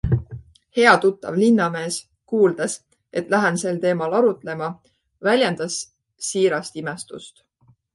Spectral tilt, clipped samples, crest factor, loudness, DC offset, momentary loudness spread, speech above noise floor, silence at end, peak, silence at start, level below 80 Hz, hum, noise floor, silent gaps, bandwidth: -5 dB/octave; under 0.1%; 20 dB; -21 LUFS; under 0.1%; 14 LU; 20 dB; 0.65 s; 0 dBFS; 0.05 s; -46 dBFS; none; -40 dBFS; none; 11.5 kHz